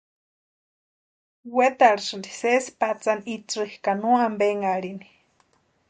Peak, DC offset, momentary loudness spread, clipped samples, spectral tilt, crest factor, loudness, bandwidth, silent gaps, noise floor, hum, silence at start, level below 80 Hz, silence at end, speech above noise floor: -4 dBFS; under 0.1%; 11 LU; under 0.1%; -4 dB/octave; 22 dB; -23 LUFS; 9.4 kHz; none; -65 dBFS; none; 1.45 s; -72 dBFS; 0.85 s; 42 dB